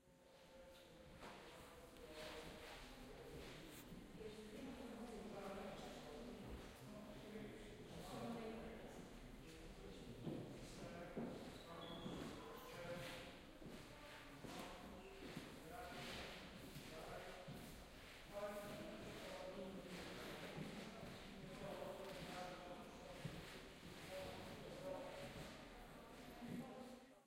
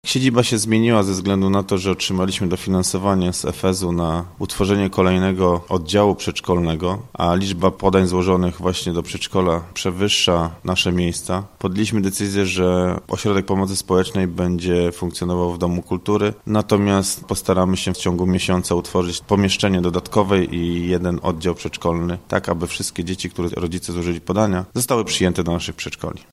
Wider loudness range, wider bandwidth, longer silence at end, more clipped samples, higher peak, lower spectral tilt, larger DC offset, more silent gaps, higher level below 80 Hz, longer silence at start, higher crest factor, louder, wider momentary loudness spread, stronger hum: about the same, 3 LU vs 3 LU; first, 16 kHz vs 14.5 kHz; about the same, 0 s vs 0.1 s; neither; second, -38 dBFS vs 0 dBFS; about the same, -5 dB/octave vs -5 dB/octave; neither; neither; second, -66 dBFS vs -42 dBFS; about the same, 0 s vs 0.05 s; about the same, 18 dB vs 18 dB; second, -55 LUFS vs -19 LUFS; about the same, 7 LU vs 7 LU; neither